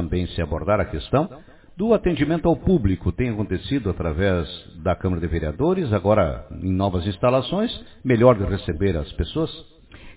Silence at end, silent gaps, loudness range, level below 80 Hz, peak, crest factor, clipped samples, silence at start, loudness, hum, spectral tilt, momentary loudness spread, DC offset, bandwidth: 0.05 s; none; 2 LU; -34 dBFS; -2 dBFS; 20 dB; under 0.1%; 0 s; -22 LUFS; none; -11.5 dB/octave; 8 LU; under 0.1%; 4 kHz